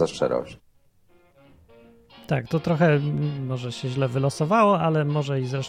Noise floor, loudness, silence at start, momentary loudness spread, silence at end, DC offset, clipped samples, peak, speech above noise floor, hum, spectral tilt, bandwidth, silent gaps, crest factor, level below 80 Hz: -59 dBFS; -23 LUFS; 0 s; 10 LU; 0 s; under 0.1%; under 0.1%; -6 dBFS; 36 dB; none; -7 dB/octave; 11 kHz; none; 18 dB; -58 dBFS